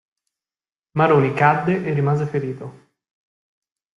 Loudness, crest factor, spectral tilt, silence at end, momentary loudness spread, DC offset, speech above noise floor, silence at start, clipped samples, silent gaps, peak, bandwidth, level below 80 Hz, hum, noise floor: -19 LUFS; 18 dB; -8.5 dB/octave; 1.25 s; 14 LU; under 0.1%; over 72 dB; 0.95 s; under 0.1%; none; -2 dBFS; 7.4 kHz; -60 dBFS; none; under -90 dBFS